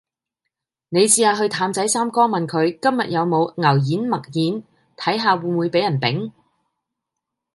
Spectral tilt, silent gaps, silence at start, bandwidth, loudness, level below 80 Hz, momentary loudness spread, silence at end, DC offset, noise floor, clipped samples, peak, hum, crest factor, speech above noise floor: -4 dB/octave; none; 0.9 s; 12 kHz; -19 LUFS; -68 dBFS; 8 LU; 1.25 s; under 0.1%; -82 dBFS; under 0.1%; -2 dBFS; none; 18 dB; 63 dB